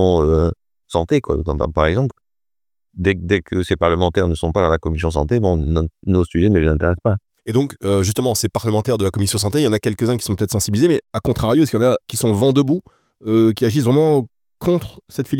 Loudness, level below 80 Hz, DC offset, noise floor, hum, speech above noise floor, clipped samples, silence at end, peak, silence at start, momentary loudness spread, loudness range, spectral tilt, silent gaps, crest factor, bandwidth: -18 LUFS; -34 dBFS; under 0.1%; under -90 dBFS; none; over 73 dB; under 0.1%; 0 s; 0 dBFS; 0 s; 6 LU; 3 LU; -6 dB/octave; none; 16 dB; 18 kHz